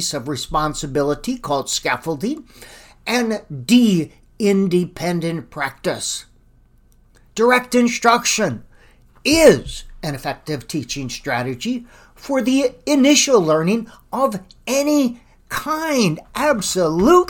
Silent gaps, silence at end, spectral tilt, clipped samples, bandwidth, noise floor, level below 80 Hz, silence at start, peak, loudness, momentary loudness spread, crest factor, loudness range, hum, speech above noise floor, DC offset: none; 0 s; -4 dB/octave; under 0.1%; 18.5 kHz; -52 dBFS; -44 dBFS; 0 s; 0 dBFS; -18 LUFS; 13 LU; 18 dB; 5 LU; none; 34 dB; under 0.1%